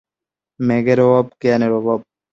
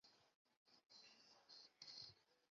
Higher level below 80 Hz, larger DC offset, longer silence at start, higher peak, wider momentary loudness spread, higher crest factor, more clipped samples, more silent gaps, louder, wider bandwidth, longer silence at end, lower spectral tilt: first, -56 dBFS vs under -90 dBFS; neither; first, 0.6 s vs 0.05 s; first, -2 dBFS vs -44 dBFS; about the same, 9 LU vs 10 LU; second, 14 dB vs 22 dB; neither; second, none vs 0.35-0.45 s, 0.57-0.66 s; first, -16 LUFS vs -62 LUFS; about the same, 7.4 kHz vs 7.2 kHz; first, 0.3 s vs 0.05 s; first, -8.5 dB/octave vs 0 dB/octave